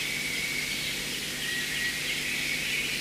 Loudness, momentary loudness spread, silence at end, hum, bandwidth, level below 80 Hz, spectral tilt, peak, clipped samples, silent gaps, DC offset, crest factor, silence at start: -28 LUFS; 3 LU; 0 s; 50 Hz at -50 dBFS; 16 kHz; -54 dBFS; -1 dB/octave; -18 dBFS; under 0.1%; none; under 0.1%; 14 dB; 0 s